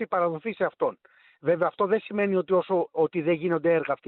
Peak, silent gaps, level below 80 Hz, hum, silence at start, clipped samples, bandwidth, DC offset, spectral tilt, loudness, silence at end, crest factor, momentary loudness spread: -12 dBFS; none; -70 dBFS; none; 0 s; under 0.1%; 4.3 kHz; under 0.1%; -10 dB/octave; -26 LUFS; 0.15 s; 14 dB; 5 LU